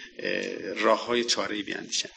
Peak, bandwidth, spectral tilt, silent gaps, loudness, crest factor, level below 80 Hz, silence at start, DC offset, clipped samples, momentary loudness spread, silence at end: -8 dBFS; 10 kHz; -2 dB/octave; none; -27 LUFS; 20 dB; -70 dBFS; 0 s; under 0.1%; under 0.1%; 7 LU; 0.05 s